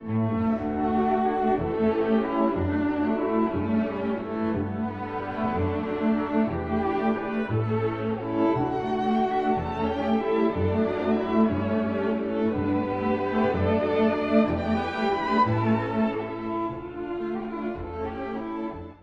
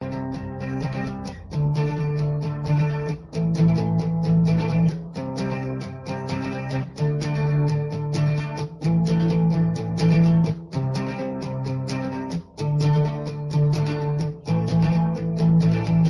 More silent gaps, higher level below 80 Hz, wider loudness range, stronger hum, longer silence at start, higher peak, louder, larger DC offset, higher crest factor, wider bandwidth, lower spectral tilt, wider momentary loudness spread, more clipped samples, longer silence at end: neither; about the same, -48 dBFS vs -46 dBFS; about the same, 3 LU vs 4 LU; neither; about the same, 0 s vs 0 s; about the same, -8 dBFS vs -8 dBFS; second, -26 LUFS vs -23 LUFS; neither; about the same, 18 dB vs 14 dB; second, 6 kHz vs 11 kHz; about the same, -9 dB/octave vs -8.5 dB/octave; about the same, 8 LU vs 10 LU; neither; about the same, 0.05 s vs 0 s